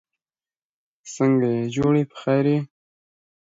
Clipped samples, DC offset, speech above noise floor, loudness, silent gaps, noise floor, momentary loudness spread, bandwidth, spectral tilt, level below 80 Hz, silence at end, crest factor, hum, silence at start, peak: under 0.1%; under 0.1%; over 70 dB; -21 LUFS; none; under -90 dBFS; 9 LU; 7.8 kHz; -7.5 dB/octave; -58 dBFS; 0.8 s; 16 dB; none; 1.05 s; -8 dBFS